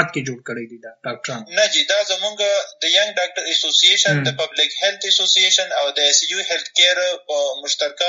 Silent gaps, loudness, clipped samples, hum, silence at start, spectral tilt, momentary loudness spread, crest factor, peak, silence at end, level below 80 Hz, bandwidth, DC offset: none; -16 LUFS; under 0.1%; none; 0 s; 0 dB/octave; 16 LU; 18 dB; 0 dBFS; 0 s; -72 dBFS; 7.8 kHz; under 0.1%